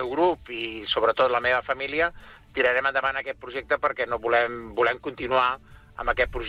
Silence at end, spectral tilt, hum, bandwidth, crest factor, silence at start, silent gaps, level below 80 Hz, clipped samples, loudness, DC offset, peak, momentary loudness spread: 0 s; -6 dB/octave; none; 6.8 kHz; 16 dB; 0 s; none; -46 dBFS; under 0.1%; -25 LUFS; under 0.1%; -10 dBFS; 10 LU